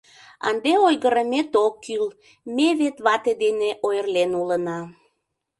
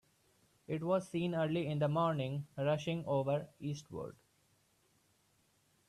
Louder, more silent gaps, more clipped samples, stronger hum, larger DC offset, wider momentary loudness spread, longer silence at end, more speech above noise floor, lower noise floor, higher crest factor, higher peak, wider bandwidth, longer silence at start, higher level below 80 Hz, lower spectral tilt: first, -22 LUFS vs -37 LUFS; neither; neither; neither; neither; about the same, 11 LU vs 10 LU; second, 0.65 s vs 1.8 s; first, 55 dB vs 38 dB; about the same, -76 dBFS vs -74 dBFS; about the same, 18 dB vs 16 dB; first, -4 dBFS vs -22 dBFS; second, 11.5 kHz vs 13 kHz; second, 0.45 s vs 0.7 s; first, -68 dBFS vs -74 dBFS; second, -4.5 dB/octave vs -7 dB/octave